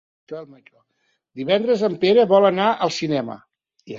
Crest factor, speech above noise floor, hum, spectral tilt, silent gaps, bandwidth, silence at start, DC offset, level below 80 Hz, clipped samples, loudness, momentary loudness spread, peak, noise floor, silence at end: 18 dB; 20 dB; none; -5.5 dB/octave; none; 7.6 kHz; 0.3 s; under 0.1%; -66 dBFS; under 0.1%; -18 LUFS; 21 LU; -2 dBFS; -39 dBFS; 0 s